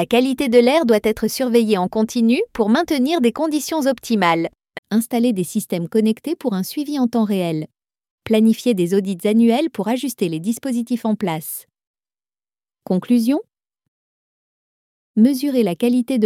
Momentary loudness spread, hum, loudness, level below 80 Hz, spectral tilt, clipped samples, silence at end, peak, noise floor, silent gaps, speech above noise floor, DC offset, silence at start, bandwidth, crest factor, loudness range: 8 LU; none; -18 LUFS; -56 dBFS; -5.5 dB/octave; under 0.1%; 0 s; -2 dBFS; under -90 dBFS; 4.78-4.83 s, 8.11-8.18 s, 11.87-11.94 s, 13.88-15.14 s; over 72 dB; under 0.1%; 0 s; 16 kHz; 18 dB; 7 LU